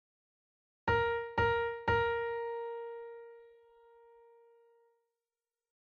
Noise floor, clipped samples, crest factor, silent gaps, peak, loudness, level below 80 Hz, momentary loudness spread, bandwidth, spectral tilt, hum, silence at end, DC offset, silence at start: under -90 dBFS; under 0.1%; 20 dB; none; -18 dBFS; -34 LUFS; -56 dBFS; 17 LU; 6.6 kHz; -6.5 dB/octave; none; 2.5 s; under 0.1%; 0.85 s